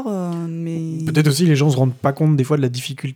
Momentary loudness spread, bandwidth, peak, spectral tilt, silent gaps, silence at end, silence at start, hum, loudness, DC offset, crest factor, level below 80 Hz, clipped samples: 10 LU; 16 kHz; -2 dBFS; -6.5 dB/octave; none; 0 s; 0 s; none; -18 LUFS; under 0.1%; 16 dB; -64 dBFS; under 0.1%